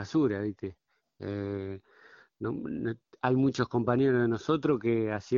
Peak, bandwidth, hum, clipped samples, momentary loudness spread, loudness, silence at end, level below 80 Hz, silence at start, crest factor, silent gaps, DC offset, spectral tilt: -12 dBFS; 7.4 kHz; none; under 0.1%; 14 LU; -30 LUFS; 0 s; -64 dBFS; 0 s; 18 dB; none; under 0.1%; -7.5 dB/octave